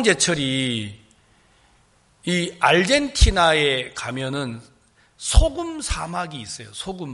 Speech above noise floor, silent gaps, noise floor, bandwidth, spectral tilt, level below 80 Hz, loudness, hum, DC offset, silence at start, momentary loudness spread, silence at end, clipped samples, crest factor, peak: 38 dB; none; -58 dBFS; 11.5 kHz; -3.5 dB/octave; -28 dBFS; -21 LUFS; none; under 0.1%; 0 s; 15 LU; 0 s; under 0.1%; 20 dB; -2 dBFS